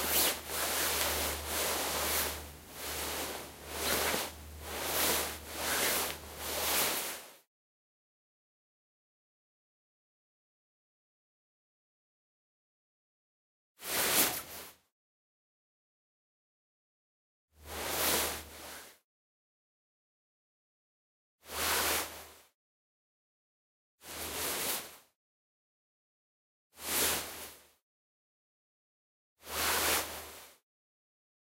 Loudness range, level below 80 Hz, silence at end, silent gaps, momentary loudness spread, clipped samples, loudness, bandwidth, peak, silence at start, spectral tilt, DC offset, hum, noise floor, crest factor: 8 LU; -58 dBFS; 0.85 s; 7.47-13.75 s, 14.92-17.48 s, 19.04-21.39 s, 22.54-23.98 s, 25.15-26.70 s, 27.82-29.36 s; 17 LU; under 0.1%; -32 LUFS; 16 kHz; -10 dBFS; 0 s; -1 dB/octave; under 0.1%; none; under -90 dBFS; 30 dB